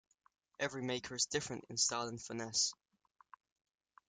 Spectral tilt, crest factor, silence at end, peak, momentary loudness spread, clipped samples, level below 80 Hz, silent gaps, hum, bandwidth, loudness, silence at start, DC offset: -1.5 dB/octave; 22 dB; 1.35 s; -20 dBFS; 8 LU; under 0.1%; -76 dBFS; none; none; 11.5 kHz; -37 LUFS; 0.6 s; under 0.1%